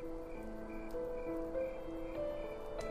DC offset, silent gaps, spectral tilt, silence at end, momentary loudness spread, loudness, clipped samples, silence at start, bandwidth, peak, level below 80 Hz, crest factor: under 0.1%; none; -6.5 dB/octave; 0 s; 6 LU; -43 LUFS; under 0.1%; 0 s; 15.5 kHz; -30 dBFS; -50 dBFS; 12 dB